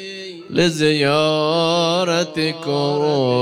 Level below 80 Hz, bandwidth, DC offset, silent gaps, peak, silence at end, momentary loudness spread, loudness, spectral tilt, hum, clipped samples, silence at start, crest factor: -60 dBFS; 15.5 kHz; under 0.1%; none; -4 dBFS; 0 s; 6 LU; -18 LUFS; -5 dB/octave; none; under 0.1%; 0 s; 14 dB